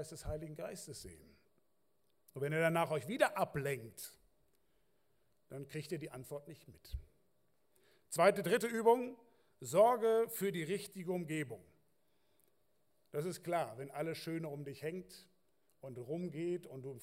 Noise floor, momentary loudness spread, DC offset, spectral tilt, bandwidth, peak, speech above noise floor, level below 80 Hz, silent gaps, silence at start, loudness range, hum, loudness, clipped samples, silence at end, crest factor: -82 dBFS; 20 LU; under 0.1%; -5 dB/octave; 16 kHz; -16 dBFS; 44 dB; -62 dBFS; none; 0 s; 15 LU; none; -37 LUFS; under 0.1%; 0 s; 22 dB